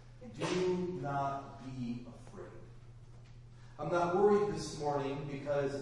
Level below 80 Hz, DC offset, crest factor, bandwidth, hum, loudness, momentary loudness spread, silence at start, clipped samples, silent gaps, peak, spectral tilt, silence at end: -58 dBFS; under 0.1%; 18 dB; 11 kHz; none; -35 LUFS; 26 LU; 0 s; under 0.1%; none; -18 dBFS; -6.5 dB/octave; 0 s